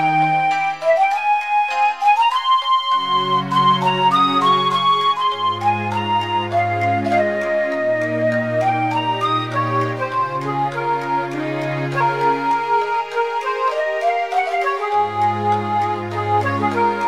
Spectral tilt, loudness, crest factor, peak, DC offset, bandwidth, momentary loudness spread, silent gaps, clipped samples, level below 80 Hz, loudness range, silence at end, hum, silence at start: -5.5 dB/octave; -18 LUFS; 14 dB; -4 dBFS; 0.3%; 14.5 kHz; 6 LU; none; under 0.1%; -64 dBFS; 4 LU; 0 s; none; 0 s